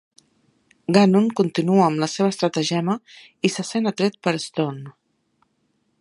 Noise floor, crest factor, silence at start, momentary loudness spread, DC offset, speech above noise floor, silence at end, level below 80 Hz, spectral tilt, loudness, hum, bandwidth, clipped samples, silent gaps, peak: -69 dBFS; 20 dB; 0.9 s; 10 LU; under 0.1%; 48 dB; 1.1 s; -68 dBFS; -5.5 dB/octave; -21 LUFS; none; 11.5 kHz; under 0.1%; none; -2 dBFS